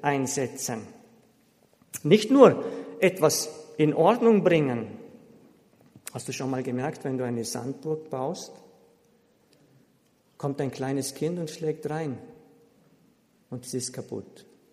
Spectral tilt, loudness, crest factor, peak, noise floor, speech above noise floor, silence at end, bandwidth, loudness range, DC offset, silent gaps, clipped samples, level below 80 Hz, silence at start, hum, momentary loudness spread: -5 dB/octave; -26 LUFS; 24 dB; -2 dBFS; -65 dBFS; 40 dB; 0.5 s; 15.5 kHz; 13 LU; under 0.1%; none; under 0.1%; -72 dBFS; 0 s; none; 19 LU